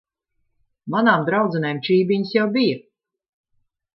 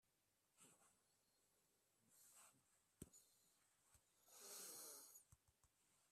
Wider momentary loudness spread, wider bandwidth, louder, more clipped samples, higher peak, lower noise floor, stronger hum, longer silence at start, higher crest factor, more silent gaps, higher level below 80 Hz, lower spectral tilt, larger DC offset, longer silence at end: second, 8 LU vs 14 LU; second, 6 kHz vs 15.5 kHz; first, -19 LUFS vs -61 LUFS; neither; first, -4 dBFS vs -42 dBFS; second, -72 dBFS vs -87 dBFS; neither; first, 0.85 s vs 0.05 s; second, 18 dB vs 26 dB; neither; first, -70 dBFS vs -88 dBFS; first, -9 dB/octave vs -1.5 dB/octave; neither; first, 1.15 s vs 0 s